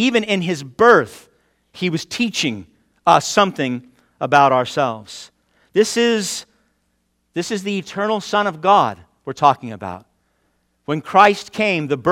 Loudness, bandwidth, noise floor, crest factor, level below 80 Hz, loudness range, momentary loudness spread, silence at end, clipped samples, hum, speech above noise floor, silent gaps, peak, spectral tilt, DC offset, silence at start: -17 LUFS; 16.5 kHz; -67 dBFS; 18 dB; -60 dBFS; 4 LU; 18 LU; 0 s; under 0.1%; none; 50 dB; none; 0 dBFS; -4 dB/octave; under 0.1%; 0 s